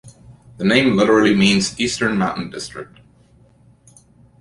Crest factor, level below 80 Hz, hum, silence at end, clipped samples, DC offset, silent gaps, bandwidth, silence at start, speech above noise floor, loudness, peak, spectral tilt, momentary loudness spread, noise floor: 18 dB; -50 dBFS; none; 1.55 s; under 0.1%; under 0.1%; none; 11.5 kHz; 0.05 s; 35 dB; -16 LUFS; -2 dBFS; -4.5 dB/octave; 16 LU; -52 dBFS